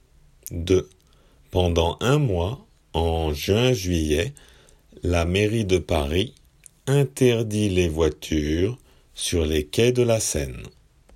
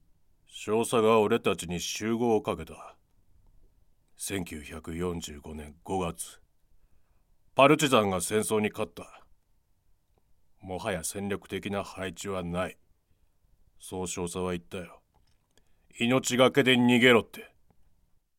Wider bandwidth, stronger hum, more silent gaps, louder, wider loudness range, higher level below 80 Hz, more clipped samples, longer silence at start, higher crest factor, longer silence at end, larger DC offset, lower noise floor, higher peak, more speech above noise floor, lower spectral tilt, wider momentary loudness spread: about the same, 16 kHz vs 16.5 kHz; neither; neither; first, -23 LUFS vs -27 LUFS; second, 2 LU vs 12 LU; first, -40 dBFS vs -58 dBFS; neither; about the same, 0.5 s vs 0.55 s; second, 18 dB vs 24 dB; second, 0.45 s vs 0.9 s; neither; second, -56 dBFS vs -68 dBFS; about the same, -6 dBFS vs -6 dBFS; second, 34 dB vs 40 dB; first, -5.5 dB/octave vs -4 dB/octave; second, 11 LU vs 20 LU